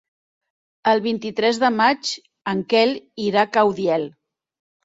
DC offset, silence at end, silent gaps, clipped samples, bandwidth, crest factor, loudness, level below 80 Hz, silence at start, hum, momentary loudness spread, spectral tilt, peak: under 0.1%; 0.75 s; none; under 0.1%; 7.8 kHz; 18 dB; -20 LUFS; -66 dBFS; 0.85 s; none; 9 LU; -4.5 dB/octave; -2 dBFS